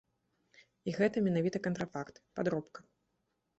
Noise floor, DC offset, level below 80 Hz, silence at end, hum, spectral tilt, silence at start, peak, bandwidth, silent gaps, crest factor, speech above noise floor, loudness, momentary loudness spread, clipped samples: -82 dBFS; under 0.1%; -72 dBFS; 0.8 s; none; -7 dB/octave; 0.85 s; -18 dBFS; 8.2 kHz; none; 20 dB; 48 dB; -35 LUFS; 13 LU; under 0.1%